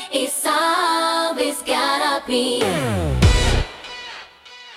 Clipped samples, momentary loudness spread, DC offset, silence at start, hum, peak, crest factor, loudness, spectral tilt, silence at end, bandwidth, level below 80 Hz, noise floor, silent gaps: under 0.1%; 16 LU; under 0.1%; 0 s; none; -2 dBFS; 18 dB; -19 LUFS; -4 dB/octave; 0 s; 16.5 kHz; -28 dBFS; -42 dBFS; none